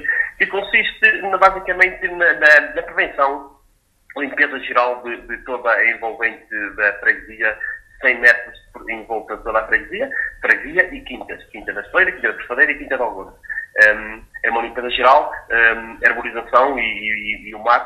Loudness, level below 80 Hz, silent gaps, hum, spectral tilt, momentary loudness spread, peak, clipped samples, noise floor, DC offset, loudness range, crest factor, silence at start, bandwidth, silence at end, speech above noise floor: -16 LUFS; -48 dBFS; none; none; -3.5 dB/octave; 15 LU; 0 dBFS; under 0.1%; -58 dBFS; under 0.1%; 5 LU; 18 dB; 0 s; 13.5 kHz; 0 s; 40 dB